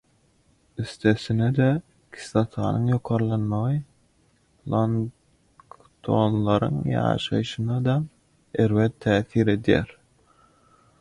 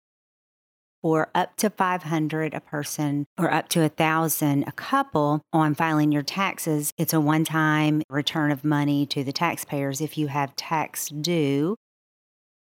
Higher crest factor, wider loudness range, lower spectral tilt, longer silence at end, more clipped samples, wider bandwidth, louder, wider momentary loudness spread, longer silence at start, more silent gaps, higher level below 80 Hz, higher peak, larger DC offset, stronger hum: about the same, 20 dB vs 18 dB; about the same, 3 LU vs 4 LU; first, -7.5 dB/octave vs -5 dB/octave; about the same, 1.1 s vs 1.05 s; neither; second, 11 kHz vs 17 kHz; about the same, -24 LUFS vs -24 LUFS; first, 12 LU vs 6 LU; second, 0.8 s vs 1.05 s; second, none vs 3.26-3.36 s, 6.92-6.97 s, 8.04-8.09 s; first, -50 dBFS vs -72 dBFS; about the same, -4 dBFS vs -6 dBFS; neither; neither